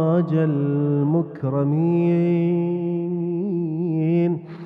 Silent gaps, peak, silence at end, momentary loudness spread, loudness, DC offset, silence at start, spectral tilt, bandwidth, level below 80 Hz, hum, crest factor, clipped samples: none; -10 dBFS; 0 s; 5 LU; -21 LUFS; under 0.1%; 0 s; -12 dB/octave; 3.8 kHz; -66 dBFS; none; 10 dB; under 0.1%